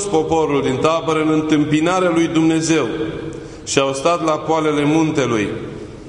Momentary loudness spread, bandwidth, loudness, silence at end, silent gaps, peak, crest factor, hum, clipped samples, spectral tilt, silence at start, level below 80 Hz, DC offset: 9 LU; 11 kHz; -17 LUFS; 0 s; none; 0 dBFS; 16 dB; none; under 0.1%; -5 dB/octave; 0 s; -46 dBFS; under 0.1%